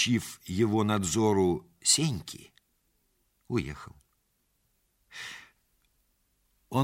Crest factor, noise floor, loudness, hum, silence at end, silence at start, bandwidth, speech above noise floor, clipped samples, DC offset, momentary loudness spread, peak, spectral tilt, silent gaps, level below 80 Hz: 22 dB; -74 dBFS; -28 LUFS; none; 0 s; 0 s; 16 kHz; 46 dB; under 0.1%; under 0.1%; 20 LU; -10 dBFS; -4 dB/octave; none; -58 dBFS